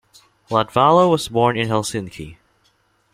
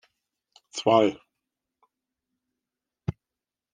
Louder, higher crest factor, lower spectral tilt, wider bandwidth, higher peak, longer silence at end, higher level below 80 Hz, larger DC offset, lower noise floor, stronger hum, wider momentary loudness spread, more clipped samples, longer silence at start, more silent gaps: first, -17 LUFS vs -25 LUFS; second, 18 dB vs 24 dB; about the same, -5.5 dB/octave vs -5.5 dB/octave; first, 16 kHz vs 9.8 kHz; first, -2 dBFS vs -6 dBFS; first, 0.8 s vs 0.6 s; first, -52 dBFS vs -62 dBFS; neither; second, -62 dBFS vs -89 dBFS; neither; first, 20 LU vs 17 LU; neither; second, 0.5 s vs 0.75 s; neither